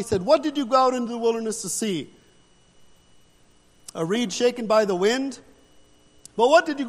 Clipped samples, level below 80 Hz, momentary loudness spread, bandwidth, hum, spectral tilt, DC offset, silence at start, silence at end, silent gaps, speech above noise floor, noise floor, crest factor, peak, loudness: under 0.1%; -60 dBFS; 14 LU; 14 kHz; none; -4 dB/octave; under 0.1%; 0 s; 0 s; none; 35 dB; -57 dBFS; 18 dB; -6 dBFS; -22 LUFS